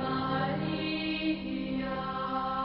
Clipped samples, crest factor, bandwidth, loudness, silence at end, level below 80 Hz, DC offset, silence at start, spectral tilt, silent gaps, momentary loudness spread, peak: under 0.1%; 14 dB; 5.8 kHz; -32 LUFS; 0 s; -54 dBFS; under 0.1%; 0 s; -10 dB/octave; none; 3 LU; -18 dBFS